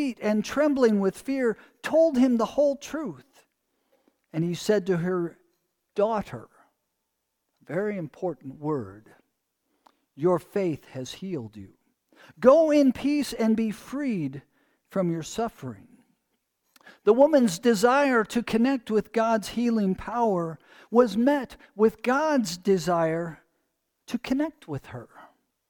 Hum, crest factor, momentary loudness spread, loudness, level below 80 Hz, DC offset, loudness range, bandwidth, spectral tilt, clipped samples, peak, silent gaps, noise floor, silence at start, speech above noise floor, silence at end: none; 22 dB; 15 LU; -25 LUFS; -60 dBFS; under 0.1%; 9 LU; 19 kHz; -6 dB/octave; under 0.1%; -4 dBFS; none; -80 dBFS; 0 s; 55 dB; 0.45 s